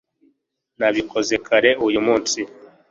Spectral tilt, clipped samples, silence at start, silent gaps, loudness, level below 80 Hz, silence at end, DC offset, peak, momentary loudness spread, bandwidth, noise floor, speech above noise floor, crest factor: -2.5 dB/octave; under 0.1%; 0.8 s; none; -19 LUFS; -56 dBFS; 0.25 s; under 0.1%; -2 dBFS; 8 LU; 7.8 kHz; -69 dBFS; 50 dB; 20 dB